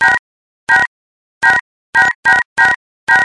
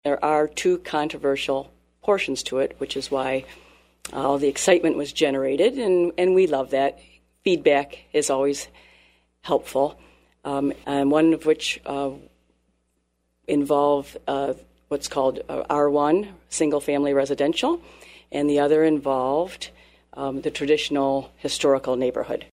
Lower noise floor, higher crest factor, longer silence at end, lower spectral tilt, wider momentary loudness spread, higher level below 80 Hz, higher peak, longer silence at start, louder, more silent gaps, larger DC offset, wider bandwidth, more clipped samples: first, under -90 dBFS vs -71 dBFS; about the same, 14 dB vs 18 dB; about the same, 0 s vs 0.05 s; second, -1.5 dB/octave vs -4 dB/octave; second, 8 LU vs 11 LU; first, -50 dBFS vs -56 dBFS; first, 0 dBFS vs -4 dBFS; about the same, 0 s vs 0.05 s; first, -12 LUFS vs -23 LUFS; first, 0.19-0.67 s, 0.87-1.41 s, 1.61-1.93 s, 2.15-2.23 s, 2.45-2.56 s, 2.76-3.07 s vs none; neither; second, 11.5 kHz vs 15.5 kHz; neither